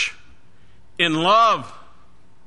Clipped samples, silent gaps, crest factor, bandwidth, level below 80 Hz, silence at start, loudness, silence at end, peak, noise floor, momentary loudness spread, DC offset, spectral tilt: under 0.1%; none; 18 dB; 10.5 kHz; -58 dBFS; 0 s; -18 LUFS; 0.75 s; -4 dBFS; -55 dBFS; 22 LU; 1%; -3.5 dB/octave